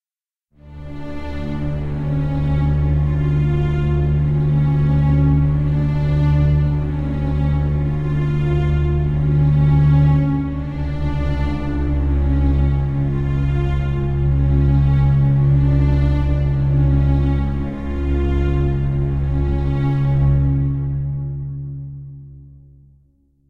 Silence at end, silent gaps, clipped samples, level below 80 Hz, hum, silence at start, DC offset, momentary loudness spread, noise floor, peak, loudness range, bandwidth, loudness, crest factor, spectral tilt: 1.05 s; none; under 0.1%; -22 dBFS; none; 0.65 s; under 0.1%; 9 LU; under -90 dBFS; -4 dBFS; 4 LU; 4.4 kHz; -18 LUFS; 12 dB; -10 dB/octave